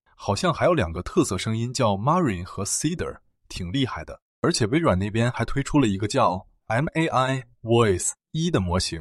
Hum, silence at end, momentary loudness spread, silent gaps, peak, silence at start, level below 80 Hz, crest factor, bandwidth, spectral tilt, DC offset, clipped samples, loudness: none; 0 s; 8 LU; 4.22-4.42 s; -6 dBFS; 0.2 s; -44 dBFS; 18 dB; 13 kHz; -5 dB/octave; under 0.1%; under 0.1%; -24 LUFS